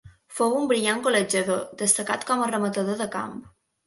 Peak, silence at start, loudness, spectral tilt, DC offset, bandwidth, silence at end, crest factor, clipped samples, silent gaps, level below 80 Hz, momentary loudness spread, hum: -6 dBFS; 0.05 s; -24 LUFS; -3 dB/octave; under 0.1%; 12 kHz; 0.4 s; 20 dB; under 0.1%; none; -66 dBFS; 10 LU; none